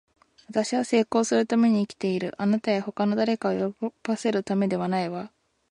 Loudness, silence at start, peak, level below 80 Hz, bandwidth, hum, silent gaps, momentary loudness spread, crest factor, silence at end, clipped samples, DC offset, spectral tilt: -25 LUFS; 0.5 s; -10 dBFS; -68 dBFS; 11 kHz; none; none; 8 LU; 16 dB; 0.45 s; under 0.1%; under 0.1%; -5.5 dB/octave